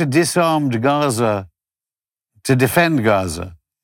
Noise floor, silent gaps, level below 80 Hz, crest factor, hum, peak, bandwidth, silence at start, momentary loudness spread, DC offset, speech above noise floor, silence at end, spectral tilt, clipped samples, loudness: under -90 dBFS; none; -52 dBFS; 14 dB; none; -4 dBFS; 18 kHz; 0 s; 12 LU; under 0.1%; over 74 dB; 0.3 s; -5.5 dB/octave; under 0.1%; -17 LUFS